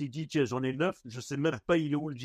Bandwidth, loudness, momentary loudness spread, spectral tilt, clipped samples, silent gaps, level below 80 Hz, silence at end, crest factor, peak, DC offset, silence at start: 13.5 kHz; -31 LUFS; 6 LU; -6 dB/octave; under 0.1%; none; -64 dBFS; 0 s; 18 dB; -14 dBFS; under 0.1%; 0 s